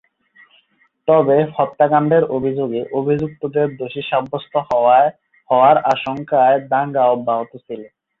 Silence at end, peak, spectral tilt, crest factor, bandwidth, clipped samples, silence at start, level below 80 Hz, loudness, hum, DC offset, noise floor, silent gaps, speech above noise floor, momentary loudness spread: 0.35 s; -2 dBFS; -8 dB/octave; 16 dB; 7 kHz; under 0.1%; 1.05 s; -58 dBFS; -17 LUFS; none; under 0.1%; -59 dBFS; none; 43 dB; 10 LU